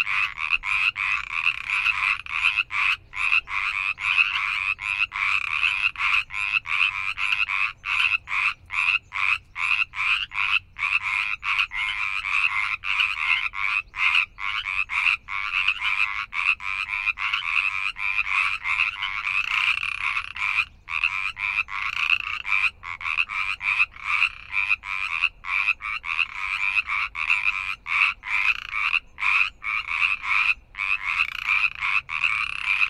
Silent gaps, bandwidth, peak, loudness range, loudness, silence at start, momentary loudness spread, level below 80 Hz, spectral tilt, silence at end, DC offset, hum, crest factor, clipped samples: none; 13 kHz; -6 dBFS; 2 LU; -22 LUFS; 0 s; 4 LU; -52 dBFS; 0.5 dB/octave; 0 s; under 0.1%; none; 20 dB; under 0.1%